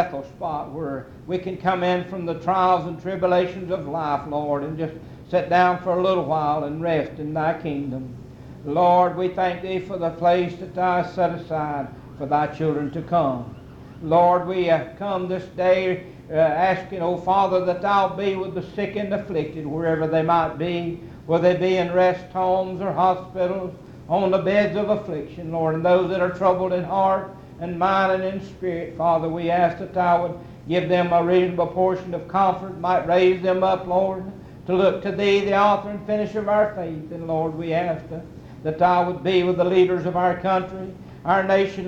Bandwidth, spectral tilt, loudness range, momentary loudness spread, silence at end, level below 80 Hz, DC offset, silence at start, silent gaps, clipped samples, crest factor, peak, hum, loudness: 7.6 kHz; -7.5 dB/octave; 3 LU; 12 LU; 0 s; -52 dBFS; under 0.1%; 0 s; none; under 0.1%; 18 dB; -4 dBFS; none; -22 LUFS